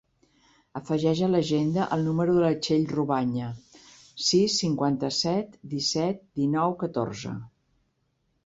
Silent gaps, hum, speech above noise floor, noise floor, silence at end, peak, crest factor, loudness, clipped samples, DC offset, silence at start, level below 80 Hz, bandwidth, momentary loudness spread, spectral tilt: none; none; 47 dB; -73 dBFS; 1 s; -10 dBFS; 16 dB; -26 LUFS; under 0.1%; under 0.1%; 0.75 s; -62 dBFS; 8 kHz; 13 LU; -5.5 dB/octave